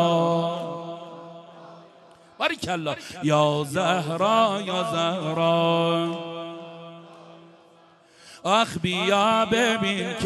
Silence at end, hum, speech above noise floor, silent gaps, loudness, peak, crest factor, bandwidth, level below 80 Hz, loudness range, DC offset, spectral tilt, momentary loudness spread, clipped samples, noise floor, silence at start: 0 s; none; 32 dB; none; -23 LUFS; -6 dBFS; 18 dB; 12.5 kHz; -60 dBFS; 5 LU; under 0.1%; -5 dB/octave; 18 LU; under 0.1%; -55 dBFS; 0 s